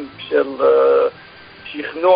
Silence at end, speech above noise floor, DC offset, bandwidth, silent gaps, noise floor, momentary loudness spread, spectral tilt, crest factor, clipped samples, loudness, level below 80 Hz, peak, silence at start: 0 s; 24 dB; under 0.1%; 5.2 kHz; none; -39 dBFS; 17 LU; -9.5 dB/octave; 14 dB; under 0.1%; -16 LUFS; -58 dBFS; -2 dBFS; 0 s